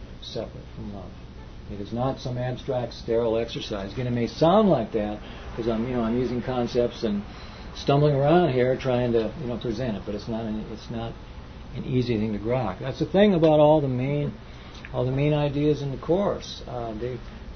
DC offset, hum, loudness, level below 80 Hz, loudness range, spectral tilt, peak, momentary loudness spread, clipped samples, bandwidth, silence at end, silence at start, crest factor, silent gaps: under 0.1%; none; -25 LUFS; -44 dBFS; 7 LU; -7.5 dB/octave; -6 dBFS; 18 LU; under 0.1%; 6.6 kHz; 0 s; 0 s; 18 dB; none